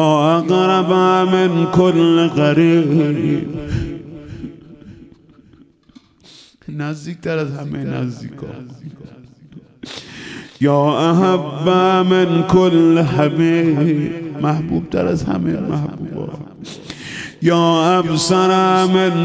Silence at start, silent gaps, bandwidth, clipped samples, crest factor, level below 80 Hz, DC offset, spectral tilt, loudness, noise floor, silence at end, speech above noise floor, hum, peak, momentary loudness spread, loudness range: 0 s; none; 8 kHz; under 0.1%; 16 dB; -44 dBFS; under 0.1%; -6.5 dB/octave; -15 LUFS; -48 dBFS; 0 s; 33 dB; none; 0 dBFS; 19 LU; 14 LU